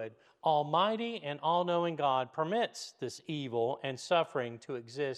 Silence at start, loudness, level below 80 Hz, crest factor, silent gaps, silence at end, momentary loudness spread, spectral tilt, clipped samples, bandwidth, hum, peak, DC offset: 0 s; -33 LUFS; -88 dBFS; 18 dB; none; 0 s; 11 LU; -5 dB/octave; under 0.1%; 12.5 kHz; none; -16 dBFS; under 0.1%